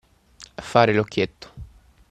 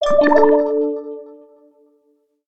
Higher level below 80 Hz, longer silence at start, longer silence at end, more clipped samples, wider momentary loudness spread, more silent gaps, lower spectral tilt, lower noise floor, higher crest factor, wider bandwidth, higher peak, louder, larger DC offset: about the same, -50 dBFS vs -50 dBFS; first, 0.4 s vs 0 s; first, 0.45 s vs 0 s; neither; first, 24 LU vs 20 LU; neither; about the same, -6 dB/octave vs -5.5 dB/octave; second, -49 dBFS vs -62 dBFS; first, 24 dB vs 16 dB; first, 13 kHz vs 8 kHz; about the same, -2 dBFS vs -2 dBFS; second, -21 LUFS vs -15 LUFS; neither